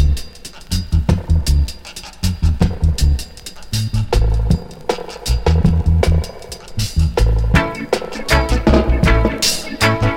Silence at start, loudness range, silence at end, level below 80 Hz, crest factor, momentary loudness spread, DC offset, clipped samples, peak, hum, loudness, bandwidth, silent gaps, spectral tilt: 0 s; 3 LU; 0 s; -20 dBFS; 16 dB; 10 LU; under 0.1%; under 0.1%; 0 dBFS; none; -17 LUFS; 16.5 kHz; none; -5.5 dB/octave